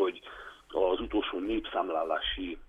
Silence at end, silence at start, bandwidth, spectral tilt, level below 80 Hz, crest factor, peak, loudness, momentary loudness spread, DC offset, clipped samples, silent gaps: 0.05 s; 0 s; 8.2 kHz; -6 dB/octave; -50 dBFS; 18 dB; -14 dBFS; -32 LUFS; 14 LU; under 0.1%; under 0.1%; none